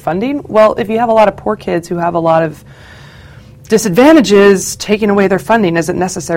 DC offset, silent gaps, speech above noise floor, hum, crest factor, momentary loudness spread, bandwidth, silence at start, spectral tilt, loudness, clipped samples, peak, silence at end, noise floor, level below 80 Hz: under 0.1%; none; 25 dB; none; 12 dB; 10 LU; 17 kHz; 0.05 s; -5 dB/octave; -11 LUFS; 0.5%; 0 dBFS; 0 s; -36 dBFS; -42 dBFS